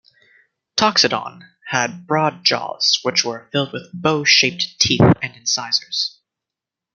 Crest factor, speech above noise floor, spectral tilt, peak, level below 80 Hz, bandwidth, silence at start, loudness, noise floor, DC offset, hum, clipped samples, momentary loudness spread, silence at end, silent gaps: 20 dB; 67 dB; -3 dB/octave; 0 dBFS; -52 dBFS; 12 kHz; 0.75 s; -17 LUFS; -86 dBFS; under 0.1%; none; under 0.1%; 10 LU; 0.85 s; none